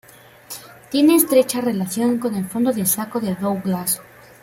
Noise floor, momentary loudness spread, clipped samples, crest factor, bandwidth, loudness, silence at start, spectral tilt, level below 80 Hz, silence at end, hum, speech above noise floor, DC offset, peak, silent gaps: -41 dBFS; 14 LU; under 0.1%; 18 dB; 16.5 kHz; -19 LUFS; 0.5 s; -4.5 dB/octave; -62 dBFS; 0.4 s; none; 22 dB; under 0.1%; -2 dBFS; none